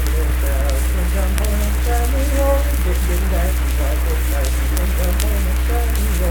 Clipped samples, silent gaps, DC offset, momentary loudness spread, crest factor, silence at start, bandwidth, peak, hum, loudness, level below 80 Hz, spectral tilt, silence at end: under 0.1%; none; under 0.1%; 2 LU; 16 dB; 0 s; 19 kHz; 0 dBFS; none; -19 LUFS; -16 dBFS; -5 dB/octave; 0 s